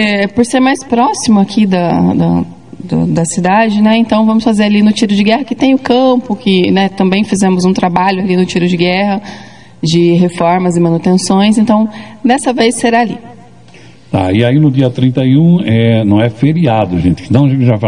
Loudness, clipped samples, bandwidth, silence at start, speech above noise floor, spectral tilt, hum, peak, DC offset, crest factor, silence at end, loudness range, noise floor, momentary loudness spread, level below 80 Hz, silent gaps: -10 LUFS; 0.2%; 11 kHz; 0 s; 28 dB; -6 dB/octave; none; 0 dBFS; 0.9%; 10 dB; 0 s; 2 LU; -38 dBFS; 4 LU; -46 dBFS; none